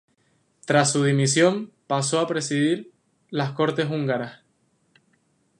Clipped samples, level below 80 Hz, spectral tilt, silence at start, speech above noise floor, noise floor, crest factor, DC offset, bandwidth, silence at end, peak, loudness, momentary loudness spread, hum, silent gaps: under 0.1%; -72 dBFS; -4.5 dB/octave; 0.65 s; 45 dB; -67 dBFS; 20 dB; under 0.1%; 11.5 kHz; 1.25 s; -4 dBFS; -23 LUFS; 11 LU; none; none